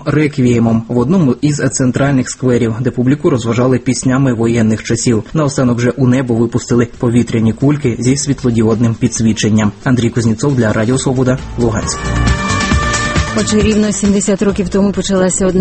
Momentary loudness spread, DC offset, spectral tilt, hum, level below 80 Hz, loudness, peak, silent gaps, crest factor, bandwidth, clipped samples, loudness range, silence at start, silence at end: 3 LU; under 0.1%; -5.5 dB/octave; none; -28 dBFS; -13 LUFS; 0 dBFS; none; 12 dB; 8.8 kHz; under 0.1%; 1 LU; 0 s; 0 s